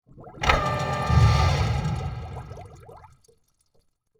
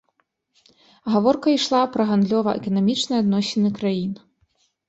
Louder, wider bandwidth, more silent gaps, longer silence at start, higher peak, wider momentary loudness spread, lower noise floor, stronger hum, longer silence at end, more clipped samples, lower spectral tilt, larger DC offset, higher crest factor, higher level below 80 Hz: about the same, -23 LUFS vs -21 LUFS; first, 12.5 kHz vs 8.2 kHz; neither; second, 0.15 s vs 1.05 s; about the same, -4 dBFS vs -6 dBFS; first, 21 LU vs 7 LU; second, -66 dBFS vs -70 dBFS; neither; first, 1.25 s vs 0.7 s; neither; about the same, -5.5 dB/octave vs -6 dB/octave; neither; about the same, 20 dB vs 16 dB; first, -32 dBFS vs -62 dBFS